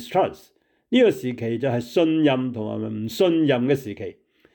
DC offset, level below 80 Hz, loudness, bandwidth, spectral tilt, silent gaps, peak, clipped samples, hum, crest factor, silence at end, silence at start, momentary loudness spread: under 0.1%; -66 dBFS; -22 LUFS; 19.5 kHz; -6.5 dB/octave; none; -8 dBFS; under 0.1%; none; 14 dB; 0.45 s; 0 s; 10 LU